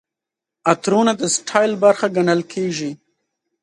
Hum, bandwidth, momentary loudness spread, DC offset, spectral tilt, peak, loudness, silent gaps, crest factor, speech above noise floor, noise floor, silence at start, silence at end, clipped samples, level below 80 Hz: none; 11.5 kHz; 8 LU; under 0.1%; -4 dB/octave; 0 dBFS; -18 LUFS; none; 18 dB; 68 dB; -85 dBFS; 0.65 s; 0.7 s; under 0.1%; -66 dBFS